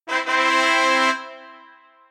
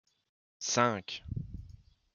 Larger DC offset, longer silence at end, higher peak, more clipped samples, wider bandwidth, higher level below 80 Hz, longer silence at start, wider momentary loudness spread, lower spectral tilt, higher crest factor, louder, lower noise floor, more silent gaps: neither; first, 0.55 s vs 0.4 s; first, -4 dBFS vs -12 dBFS; neither; first, 14.5 kHz vs 10.5 kHz; second, under -90 dBFS vs -54 dBFS; second, 0.05 s vs 0.6 s; second, 11 LU vs 17 LU; second, 1 dB/octave vs -3.5 dB/octave; second, 18 dB vs 24 dB; first, -18 LUFS vs -33 LUFS; second, -50 dBFS vs -56 dBFS; neither